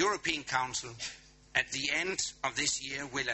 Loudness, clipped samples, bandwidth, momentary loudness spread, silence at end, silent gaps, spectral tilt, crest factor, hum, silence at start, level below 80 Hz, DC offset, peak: -33 LUFS; under 0.1%; 8.4 kHz; 10 LU; 0 s; none; -1.5 dB/octave; 22 dB; none; 0 s; -62 dBFS; under 0.1%; -12 dBFS